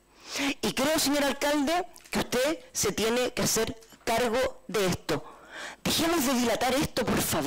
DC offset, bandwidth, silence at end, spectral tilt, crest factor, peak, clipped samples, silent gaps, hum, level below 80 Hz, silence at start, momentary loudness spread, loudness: under 0.1%; 16.5 kHz; 0 s; -3 dB/octave; 6 dB; -22 dBFS; under 0.1%; none; none; -50 dBFS; 0.2 s; 9 LU; -27 LUFS